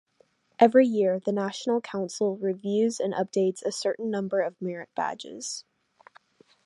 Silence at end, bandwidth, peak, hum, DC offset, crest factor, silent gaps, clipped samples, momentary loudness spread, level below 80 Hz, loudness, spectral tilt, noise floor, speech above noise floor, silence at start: 1.05 s; 11.5 kHz; -4 dBFS; none; under 0.1%; 22 dB; none; under 0.1%; 14 LU; -78 dBFS; -27 LUFS; -5 dB/octave; -66 dBFS; 40 dB; 0.6 s